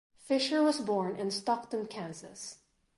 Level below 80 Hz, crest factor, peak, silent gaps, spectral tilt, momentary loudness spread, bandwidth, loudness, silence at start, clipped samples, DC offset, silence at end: -76 dBFS; 16 dB; -18 dBFS; none; -4 dB/octave; 16 LU; 11.5 kHz; -32 LUFS; 0.25 s; under 0.1%; under 0.1%; 0.4 s